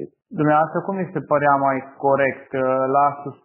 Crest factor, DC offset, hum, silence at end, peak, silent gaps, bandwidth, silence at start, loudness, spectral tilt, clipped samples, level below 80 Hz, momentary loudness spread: 16 dB; under 0.1%; none; 0.1 s; -4 dBFS; none; 3.2 kHz; 0 s; -20 LUFS; -6.5 dB/octave; under 0.1%; -68 dBFS; 7 LU